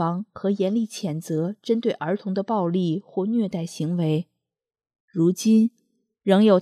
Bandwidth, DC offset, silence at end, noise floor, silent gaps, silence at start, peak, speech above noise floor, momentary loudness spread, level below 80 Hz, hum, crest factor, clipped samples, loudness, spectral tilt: 14 kHz; under 0.1%; 0 s; -87 dBFS; 5.00-5.08 s; 0 s; -4 dBFS; 65 dB; 9 LU; -74 dBFS; none; 18 dB; under 0.1%; -24 LUFS; -7 dB/octave